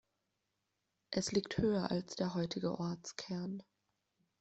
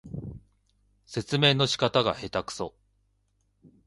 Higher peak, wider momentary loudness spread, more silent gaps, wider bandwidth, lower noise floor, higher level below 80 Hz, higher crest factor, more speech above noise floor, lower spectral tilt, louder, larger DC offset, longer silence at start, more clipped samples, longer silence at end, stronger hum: second, -18 dBFS vs -6 dBFS; second, 9 LU vs 18 LU; neither; second, 8.2 kHz vs 11.5 kHz; first, -86 dBFS vs -71 dBFS; second, -66 dBFS vs -56 dBFS; about the same, 20 dB vs 22 dB; about the same, 48 dB vs 45 dB; about the same, -5.5 dB/octave vs -4.5 dB/octave; second, -38 LUFS vs -26 LUFS; neither; first, 1.1 s vs 0.05 s; neither; second, 0.8 s vs 1.15 s; second, none vs 50 Hz at -55 dBFS